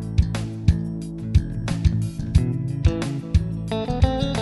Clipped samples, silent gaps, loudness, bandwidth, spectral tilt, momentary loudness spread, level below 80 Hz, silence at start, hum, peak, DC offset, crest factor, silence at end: under 0.1%; none; -23 LUFS; 11.5 kHz; -7.5 dB/octave; 5 LU; -26 dBFS; 0 s; none; -4 dBFS; under 0.1%; 18 dB; 0 s